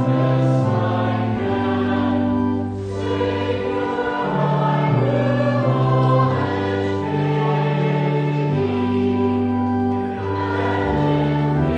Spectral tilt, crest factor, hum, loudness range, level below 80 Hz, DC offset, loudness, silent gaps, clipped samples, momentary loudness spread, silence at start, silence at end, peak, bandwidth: -8.5 dB/octave; 12 dB; none; 2 LU; -44 dBFS; under 0.1%; -20 LUFS; none; under 0.1%; 4 LU; 0 s; 0 s; -6 dBFS; 8.6 kHz